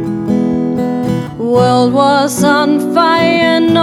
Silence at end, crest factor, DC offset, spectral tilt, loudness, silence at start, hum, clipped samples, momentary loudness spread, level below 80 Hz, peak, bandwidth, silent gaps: 0 s; 12 dB; under 0.1%; -5.5 dB/octave; -12 LUFS; 0 s; none; under 0.1%; 6 LU; -46 dBFS; 0 dBFS; 15 kHz; none